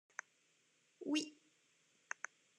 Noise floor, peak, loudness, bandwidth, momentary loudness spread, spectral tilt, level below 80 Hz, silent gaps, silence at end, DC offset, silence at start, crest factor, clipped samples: -77 dBFS; -22 dBFS; -45 LUFS; 11.5 kHz; 13 LU; -1.5 dB/octave; under -90 dBFS; none; 1.25 s; under 0.1%; 1 s; 26 dB; under 0.1%